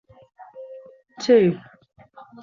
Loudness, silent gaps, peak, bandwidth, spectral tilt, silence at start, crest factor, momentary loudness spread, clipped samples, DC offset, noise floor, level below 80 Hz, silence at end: -19 LUFS; none; -6 dBFS; 7.4 kHz; -6.5 dB/octave; 0.55 s; 18 dB; 25 LU; under 0.1%; under 0.1%; -44 dBFS; -66 dBFS; 0.85 s